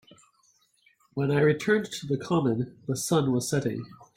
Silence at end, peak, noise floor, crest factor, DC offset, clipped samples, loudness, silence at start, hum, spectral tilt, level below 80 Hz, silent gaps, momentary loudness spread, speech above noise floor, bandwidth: 0.1 s; -10 dBFS; -66 dBFS; 18 dB; under 0.1%; under 0.1%; -27 LUFS; 1.15 s; none; -5.5 dB/octave; -64 dBFS; none; 9 LU; 40 dB; 16.5 kHz